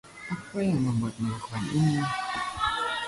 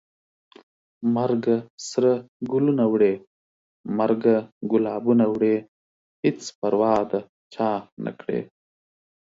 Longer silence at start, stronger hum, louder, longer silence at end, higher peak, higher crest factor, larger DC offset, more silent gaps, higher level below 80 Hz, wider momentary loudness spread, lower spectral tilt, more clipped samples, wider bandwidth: second, 0.05 s vs 1 s; neither; second, -29 LUFS vs -23 LUFS; second, 0 s vs 0.8 s; second, -14 dBFS vs -6 dBFS; about the same, 14 dB vs 18 dB; neither; second, none vs 1.70-1.78 s, 2.28-2.40 s, 3.27-3.84 s, 4.52-4.61 s, 5.68-6.23 s, 6.55-6.62 s, 7.29-7.50 s, 7.92-7.97 s; first, -54 dBFS vs -66 dBFS; about the same, 8 LU vs 10 LU; about the same, -6 dB/octave vs -7 dB/octave; neither; first, 11.5 kHz vs 7.8 kHz